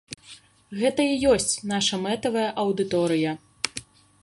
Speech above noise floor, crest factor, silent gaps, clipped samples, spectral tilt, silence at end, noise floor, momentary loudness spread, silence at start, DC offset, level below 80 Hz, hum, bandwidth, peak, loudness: 26 dB; 24 dB; none; under 0.1%; -3.5 dB/octave; 0.4 s; -50 dBFS; 14 LU; 0.1 s; under 0.1%; -54 dBFS; none; 11.5 kHz; -2 dBFS; -24 LUFS